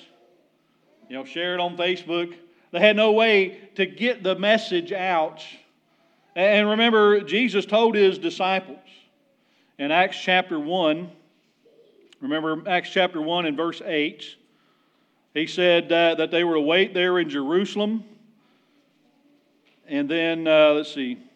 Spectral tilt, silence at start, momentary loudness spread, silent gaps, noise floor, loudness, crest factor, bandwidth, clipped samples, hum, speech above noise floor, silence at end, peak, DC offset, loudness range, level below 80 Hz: -5 dB/octave; 1.1 s; 13 LU; none; -65 dBFS; -21 LUFS; 20 dB; 8.8 kHz; under 0.1%; none; 43 dB; 0.2 s; -4 dBFS; under 0.1%; 5 LU; -90 dBFS